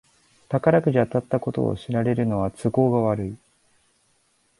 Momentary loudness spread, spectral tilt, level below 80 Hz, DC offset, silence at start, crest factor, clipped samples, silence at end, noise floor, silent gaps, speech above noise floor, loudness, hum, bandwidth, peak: 9 LU; -9 dB/octave; -52 dBFS; under 0.1%; 0.5 s; 18 dB; under 0.1%; 1.25 s; -65 dBFS; none; 44 dB; -23 LUFS; none; 11.5 kHz; -4 dBFS